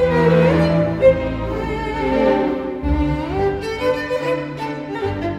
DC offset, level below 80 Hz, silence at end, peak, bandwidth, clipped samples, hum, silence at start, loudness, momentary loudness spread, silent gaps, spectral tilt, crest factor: under 0.1%; -30 dBFS; 0 s; -2 dBFS; 11.5 kHz; under 0.1%; none; 0 s; -19 LUFS; 9 LU; none; -8 dB/octave; 16 dB